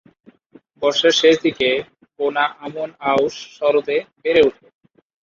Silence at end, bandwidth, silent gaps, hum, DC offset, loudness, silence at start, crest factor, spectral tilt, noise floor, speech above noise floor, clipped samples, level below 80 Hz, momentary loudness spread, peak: 0.75 s; 7.4 kHz; none; none; under 0.1%; -18 LUFS; 0.8 s; 18 dB; -3 dB/octave; -51 dBFS; 34 dB; under 0.1%; -60 dBFS; 10 LU; -2 dBFS